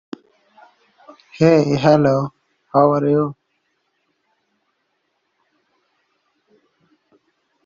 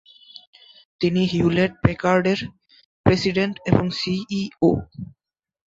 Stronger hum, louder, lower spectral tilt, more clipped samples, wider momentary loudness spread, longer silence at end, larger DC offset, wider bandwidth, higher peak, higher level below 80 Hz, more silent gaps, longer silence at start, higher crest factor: neither; first, -16 LUFS vs -21 LUFS; about the same, -7 dB/octave vs -6.5 dB/octave; neither; first, 15 LU vs 9 LU; first, 4.35 s vs 0.6 s; neither; about the same, 7.4 kHz vs 7.8 kHz; about the same, -2 dBFS vs 0 dBFS; second, -58 dBFS vs -44 dBFS; second, none vs 2.85-3.04 s; first, 1.35 s vs 1 s; about the same, 20 dB vs 22 dB